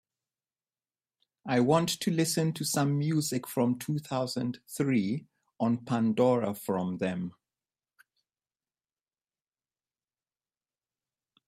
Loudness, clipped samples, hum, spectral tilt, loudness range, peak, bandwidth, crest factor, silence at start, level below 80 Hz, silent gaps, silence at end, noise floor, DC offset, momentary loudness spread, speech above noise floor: -29 LUFS; under 0.1%; none; -5.5 dB/octave; 9 LU; -10 dBFS; 15.5 kHz; 20 dB; 1.45 s; -72 dBFS; none; 4.15 s; under -90 dBFS; under 0.1%; 9 LU; over 61 dB